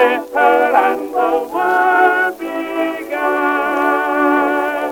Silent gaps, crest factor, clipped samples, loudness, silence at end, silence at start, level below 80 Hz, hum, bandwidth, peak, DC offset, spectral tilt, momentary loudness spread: none; 14 dB; under 0.1%; -15 LUFS; 0 s; 0 s; -56 dBFS; none; 18 kHz; 0 dBFS; under 0.1%; -3.5 dB/octave; 8 LU